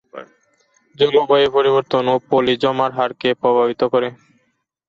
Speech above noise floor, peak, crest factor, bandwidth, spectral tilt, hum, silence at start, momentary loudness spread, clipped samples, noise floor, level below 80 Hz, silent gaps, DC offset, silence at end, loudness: 51 dB; -4 dBFS; 14 dB; 7.2 kHz; -6.5 dB/octave; none; 0.15 s; 6 LU; under 0.1%; -68 dBFS; -60 dBFS; none; under 0.1%; 0.75 s; -17 LUFS